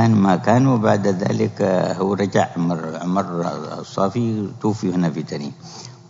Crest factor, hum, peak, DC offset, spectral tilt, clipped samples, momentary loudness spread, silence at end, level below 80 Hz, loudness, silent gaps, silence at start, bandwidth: 18 dB; none; -2 dBFS; under 0.1%; -7 dB/octave; under 0.1%; 13 LU; 0.15 s; -62 dBFS; -20 LUFS; none; 0 s; 7.8 kHz